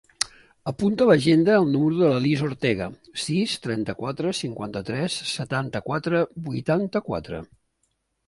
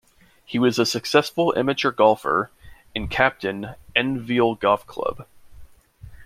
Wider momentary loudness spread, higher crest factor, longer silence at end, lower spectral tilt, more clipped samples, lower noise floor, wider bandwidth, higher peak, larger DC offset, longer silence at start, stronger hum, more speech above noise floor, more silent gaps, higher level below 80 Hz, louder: about the same, 13 LU vs 11 LU; about the same, 22 dB vs 20 dB; first, 0.8 s vs 0 s; about the same, -5.5 dB/octave vs -4.5 dB/octave; neither; first, -73 dBFS vs -45 dBFS; second, 11.5 kHz vs 16 kHz; about the same, -2 dBFS vs -2 dBFS; neither; second, 0.2 s vs 0.5 s; neither; first, 50 dB vs 24 dB; neither; second, -56 dBFS vs -48 dBFS; second, -24 LUFS vs -21 LUFS